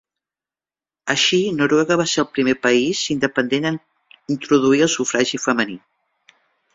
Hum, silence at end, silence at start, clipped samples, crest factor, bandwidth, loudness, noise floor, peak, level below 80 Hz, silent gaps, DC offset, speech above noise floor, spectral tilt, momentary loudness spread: none; 0.95 s; 1.05 s; under 0.1%; 18 dB; 7.8 kHz; -18 LUFS; under -90 dBFS; -2 dBFS; -60 dBFS; none; under 0.1%; over 72 dB; -3.5 dB/octave; 10 LU